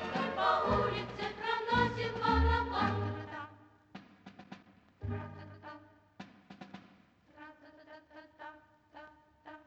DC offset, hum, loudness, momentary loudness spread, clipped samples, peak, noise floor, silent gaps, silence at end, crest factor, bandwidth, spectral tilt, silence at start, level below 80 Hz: under 0.1%; none; -33 LUFS; 25 LU; under 0.1%; -18 dBFS; -64 dBFS; none; 0.1 s; 20 dB; 8 kHz; -6.5 dB/octave; 0 s; -48 dBFS